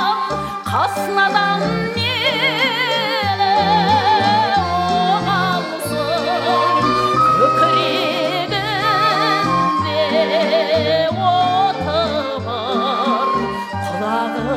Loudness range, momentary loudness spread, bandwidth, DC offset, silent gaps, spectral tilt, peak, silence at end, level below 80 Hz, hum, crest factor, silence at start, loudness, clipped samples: 2 LU; 6 LU; 16.5 kHz; under 0.1%; none; -5 dB/octave; -2 dBFS; 0 s; -48 dBFS; none; 14 dB; 0 s; -16 LUFS; under 0.1%